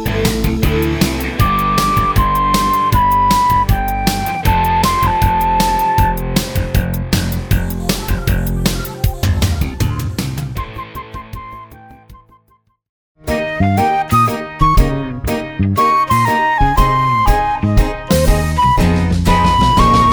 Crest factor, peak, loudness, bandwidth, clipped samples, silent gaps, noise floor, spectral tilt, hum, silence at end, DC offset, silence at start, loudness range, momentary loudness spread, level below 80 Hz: 14 dB; 0 dBFS; -15 LUFS; over 20 kHz; under 0.1%; 12.89-13.15 s; -57 dBFS; -5.5 dB/octave; none; 0 s; under 0.1%; 0 s; 8 LU; 9 LU; -22 dBFS